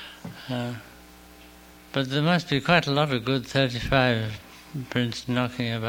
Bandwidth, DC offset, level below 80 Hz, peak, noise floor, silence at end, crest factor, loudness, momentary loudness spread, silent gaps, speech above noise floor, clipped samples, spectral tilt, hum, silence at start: 17 kHz; under 0.1%; -48 dBFS; -4 dBFS; -49 dBFS; 0 s; 22 dB; -25 LUFS; 17 LU; none; 24 dB; under 0.1%; -6 dB/octave; none; 0 s